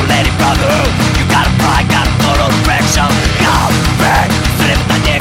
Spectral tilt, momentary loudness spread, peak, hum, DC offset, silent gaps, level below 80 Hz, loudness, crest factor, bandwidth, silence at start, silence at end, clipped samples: -4.5 dB/octave; 1 LU; 0 dBFS; none; under 0.1%; none; -20 dBFS; -11 LUFS; 10 dB; 16.5 kHz; 0 s; 0 s; under 0.1%